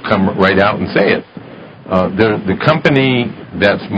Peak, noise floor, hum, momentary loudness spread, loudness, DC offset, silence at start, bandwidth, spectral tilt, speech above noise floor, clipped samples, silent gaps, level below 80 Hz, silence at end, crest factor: 0 dBFS; -33 dBFS; none; 9 LU; -13 LUFS; under 0.1%; 0 s; 8 kHz; -8 dB/octave; 21 dB; 0.2%; none; -40 dBFS; 0 s; 14 dB